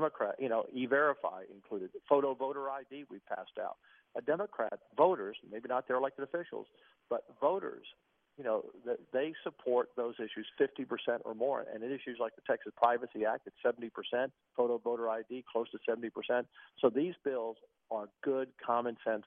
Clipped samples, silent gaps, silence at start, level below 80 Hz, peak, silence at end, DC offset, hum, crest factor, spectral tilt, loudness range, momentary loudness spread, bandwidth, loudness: under 0.1%; none; 0 s; -84 dBFS; -14 dBFS; 0.05 s; under 0.1%; none; 22 dB; -3 dB/octave; 3 LU; 12 LU; 4.2 kHz; -36 LUFS